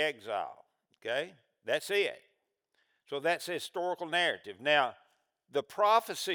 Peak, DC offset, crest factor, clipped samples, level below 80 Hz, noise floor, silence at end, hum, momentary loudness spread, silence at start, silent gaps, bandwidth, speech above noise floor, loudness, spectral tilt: -12 dBFS; under 0.1%; 22 dB; under 0.1%; under -90 dBFS; -79 dBFS; 0 s; none; 15 LU; 0 s; none; over 20 kHz; 47 dB; -32 LUFS; -2.5 dB/octave